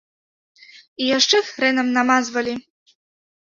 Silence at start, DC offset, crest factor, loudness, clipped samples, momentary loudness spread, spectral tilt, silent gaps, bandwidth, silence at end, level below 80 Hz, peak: 1 s; under 0.1%; 20 dB; -18 LUFS; under 0.1%; 12 LU; -1.5 dB/octave; none; 7.6 kHz; 0.85 s; -66 dBFS; -2 dBFS